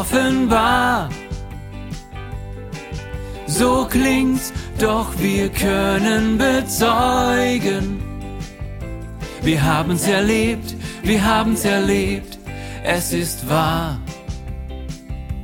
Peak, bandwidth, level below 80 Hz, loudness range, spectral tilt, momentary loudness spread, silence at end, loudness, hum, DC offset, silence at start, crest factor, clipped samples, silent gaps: -2 dBFS; 17 kHz; -32 dBFS; 4 LU; -4.5 dB/octave; 16 LU; 0 s; -18 LUFS; none; under 0.1%; 0 s; 18 dB; under 0.1%; none